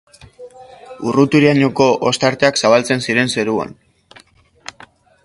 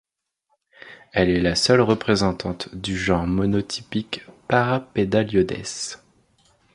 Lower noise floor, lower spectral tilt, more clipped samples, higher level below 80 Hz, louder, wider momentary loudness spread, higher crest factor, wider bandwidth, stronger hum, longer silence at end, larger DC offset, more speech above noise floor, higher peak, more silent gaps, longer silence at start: second, -48 dBFS vs -73 dBFS; about the same, -5 dB/octave vs -5 dB/octave; neither; second, -54 dBFS vs -44 dBFS; first, -14 LUFS vs -22 LUFS; first, 22 LU vs 12 LU; about the same, 16 dB vs 20 dB; about the same, 11.5 kHz vs 11.5 kHz; neither; first, 1.55 s vs 0.8 s; neither; second, 34 dB vs 52 dB; about the same, 0 dBFS vs -2 dBFS; neither; second, 0.4 s vs 0.85 s